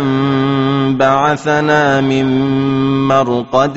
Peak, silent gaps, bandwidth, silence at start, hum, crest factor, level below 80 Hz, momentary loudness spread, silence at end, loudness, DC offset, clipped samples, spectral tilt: 0 dBFS; none; 8 kHz; 0 s; none; 12 dB; -46 dBFS; 3 LU; 0 s; -13 LUFS; 0.3%; under 0.1%; -5 dB/octave